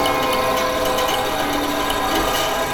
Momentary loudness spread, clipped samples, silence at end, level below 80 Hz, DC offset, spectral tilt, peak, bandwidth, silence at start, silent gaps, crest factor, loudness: 2 LU; under 0.1%; 0 s; -38 dBFS; under 0.1%; -2.5 dB/octave; -6 dBFS; over 20 kHz; 0 s; none; 12 dB; -19 LUFS